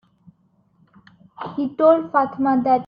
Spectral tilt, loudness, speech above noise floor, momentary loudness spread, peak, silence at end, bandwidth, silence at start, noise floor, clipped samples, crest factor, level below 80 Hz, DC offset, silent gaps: -9.5 dB/octave; -19 LUFS; 43 dB; 14 LU; -4 dBFS; 0 s; 5.2 kHz; 1.4 s; -61 dBFS; under 0.1%; 18 dB; -64 dBFS; under 0.1%; none